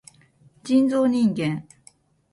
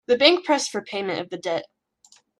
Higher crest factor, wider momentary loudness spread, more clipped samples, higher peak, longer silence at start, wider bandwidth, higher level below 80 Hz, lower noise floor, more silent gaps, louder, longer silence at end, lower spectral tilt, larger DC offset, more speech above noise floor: second, 16 dB vs 24 dB; about the same, 13 LU vs 12 LU; neither; second, -8 dBFS vs 0 dBFS; first, 0.65 s vs 0.1 s; about the same, 11.5 kHz vs 12 kHz; about the same, -64 dBFS vs -68 dBFS; about the same, -56 dBFS vs -58 dBFS; neither; about the same, -22 LUFS vs -22 LUFS; about the same, 0.7 s vs 0.75 s; first, -7 dB/octave vs -2.5 dB/octave; neither; about the same, 36 dB vs 36 dB